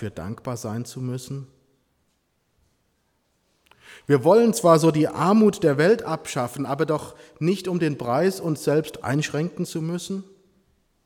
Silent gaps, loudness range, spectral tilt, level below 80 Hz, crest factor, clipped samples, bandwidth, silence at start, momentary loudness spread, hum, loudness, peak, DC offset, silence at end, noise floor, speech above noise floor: none; 16 LU; -6 dB/octave; -60 dBFS; 20 dB; under 0.1%; 18 kHz; 0 s; 16 LU; none; -22 LUFS; -2 dBFS; under 0.1%; 0.85 s; -70 dBFS; 48 dB